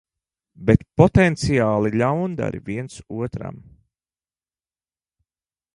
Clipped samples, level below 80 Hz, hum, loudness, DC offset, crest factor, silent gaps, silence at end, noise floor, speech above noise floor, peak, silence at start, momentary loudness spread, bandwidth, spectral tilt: under 0.1%; -42 dBFS; none; -20 LUFS; under 0.1%; 22 dB; none; 2.2 s; under -90 dBFS; over 70 dB; 0 dBFS; 0.6 s; 15 LU; 11 kHz; -7.5 dB/octave